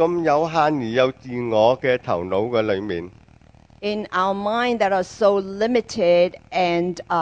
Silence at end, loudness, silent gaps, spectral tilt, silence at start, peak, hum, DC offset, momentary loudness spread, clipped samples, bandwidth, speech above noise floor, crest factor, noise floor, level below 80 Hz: 0 s; -21 LUFS; none; -6 dB/octave; 0 s; -2 dBFS; none; under 0.1%; 8 LU; under 0.1%; 9 kHz; 30 dB; 18 dB; -50 dBFS; -54 dBFS